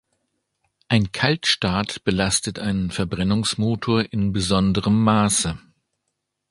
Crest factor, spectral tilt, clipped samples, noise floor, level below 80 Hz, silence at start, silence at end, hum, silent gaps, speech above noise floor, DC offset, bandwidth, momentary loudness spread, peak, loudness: 20 dB; -4.5 dB/octave; under 0.1%; -78 dBFS; -42 dBFS; 0.9 s; 0.9 s; none; none; 57 dB; under 0.1%; 11.5 kHz; 6 LU; -2 dBFS; -21 LUFS